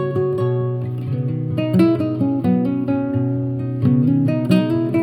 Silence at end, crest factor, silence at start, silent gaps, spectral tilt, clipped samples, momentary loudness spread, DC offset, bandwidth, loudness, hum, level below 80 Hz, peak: 0 s; 16 dB; 0 s; none; -9.5 dB/octave; under 0.1%; 7 LU; under 0.1%; 11.5 kHz; -19 LUFS; none; -54 dBFS; -2 dBFS